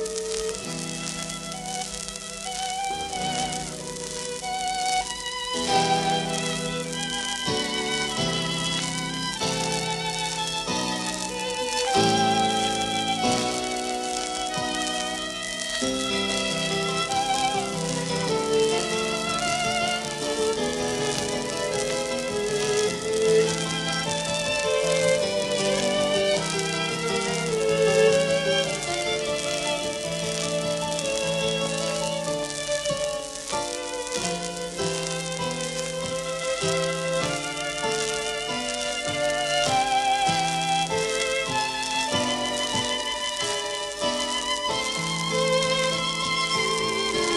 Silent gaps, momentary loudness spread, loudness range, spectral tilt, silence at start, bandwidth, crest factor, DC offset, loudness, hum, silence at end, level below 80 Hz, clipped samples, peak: none; 7 LU; 4 LU; -2.5 dB/octave; 0 s; 13.5 kHz; 18 dB; under 0.1%; -25 LUFS; none; 0 s; -52 dBFS; under 0.1%; -8 dBFS